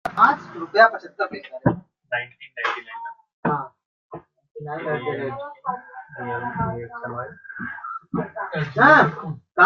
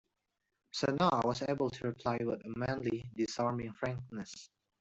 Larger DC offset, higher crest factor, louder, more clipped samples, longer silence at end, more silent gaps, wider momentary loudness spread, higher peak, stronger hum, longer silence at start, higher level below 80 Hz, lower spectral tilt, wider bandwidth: neither; about the same, 22 dB vs 20 dB; first, -22 LUFS vs -36 LUFS; neither; second, 0 s vs 0.35 s; first, 3.33-3.43 s, 3.85-4.10 s, 4.51-4.55 s vs none; first, 19 LU vs 13 LU; first, 0 dBFS vs -16 dBFS; neither; second, 0.05 s vs 0.75 s; first, -58 dBFS vs -66 dBFS; about the same, -7 dB/octave vs -6 dB/octave; second, 7.4 kHz vs 8.2 kHz